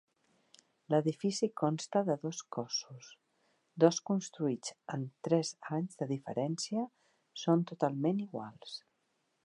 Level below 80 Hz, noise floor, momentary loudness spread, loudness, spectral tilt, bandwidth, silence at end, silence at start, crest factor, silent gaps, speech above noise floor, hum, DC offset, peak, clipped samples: -86 dBFS; -79 dBFS; 14 LU; -34 LUFS; -5.5 dB/octave; 11 kHz; 0.65 s; 0.9 s; 24 dB; none; 45 dB; none; under 0.1%; -12 dBFS; under 0.1%